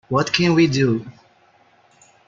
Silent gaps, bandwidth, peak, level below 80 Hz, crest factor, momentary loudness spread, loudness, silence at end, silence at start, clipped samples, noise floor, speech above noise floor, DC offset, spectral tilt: none; 7.6 kHz; -2 dBFS; -56 dBFS; 20 dB; 6 LU; -18 LUFS; 1.15 s; 0.1 s; under 0.1%; -56 dBFS; 38 dB; under 0.1%; -5.5 dB/octave